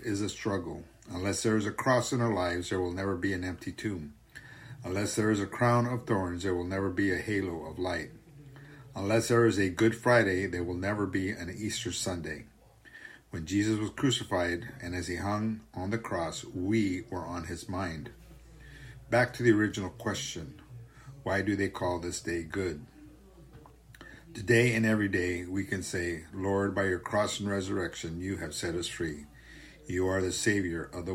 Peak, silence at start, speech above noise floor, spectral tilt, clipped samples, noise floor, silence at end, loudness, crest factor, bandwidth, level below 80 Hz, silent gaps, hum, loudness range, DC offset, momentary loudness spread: -12 dBFS; 0 s; 24 dB; -5 dB/octave; under 0.1%; -54 dBFS; 0 s; -31 LUFS; 20 dB; 16 kHz; -56 dBFS; none; none; 5 LU; under 0.1%; 19 LU